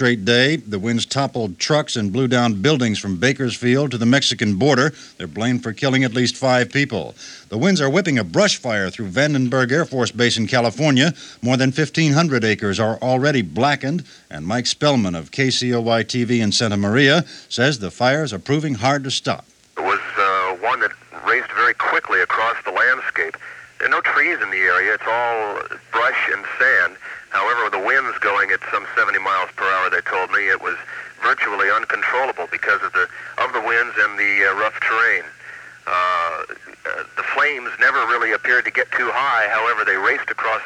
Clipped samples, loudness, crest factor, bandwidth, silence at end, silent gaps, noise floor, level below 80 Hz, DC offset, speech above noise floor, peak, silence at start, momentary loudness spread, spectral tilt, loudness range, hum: under 0.1%; -18 LUFS; 18 dB; 11 kHz; 0 s; none; -39 dBFS; -60 dBFS; under 0.1%; 20 dB; -2 dBFS; 0 s; 8 LU; -4.5 dB/octave; 2 LU; none